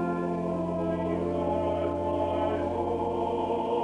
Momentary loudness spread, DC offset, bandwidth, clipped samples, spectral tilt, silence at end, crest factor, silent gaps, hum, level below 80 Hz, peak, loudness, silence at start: 2 LU; under 0.1%; 10.5 kHz; under 0.1%; -8.5 dB/octave; 0 s; 12 dB; none; none; -54 dBFS; -16 dBFS; -29 LUFS; 0 s